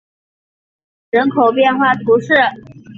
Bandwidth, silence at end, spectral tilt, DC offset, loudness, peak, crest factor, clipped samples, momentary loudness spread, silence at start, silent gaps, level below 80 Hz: 7.2 kHz; 0.05 s; -6.5 dB/octave; under 0.1%; -13 LUFS; -2 dBFS; 14 dB; under 0.1%; 5 LU; 1.15 s; none; -58 dBFS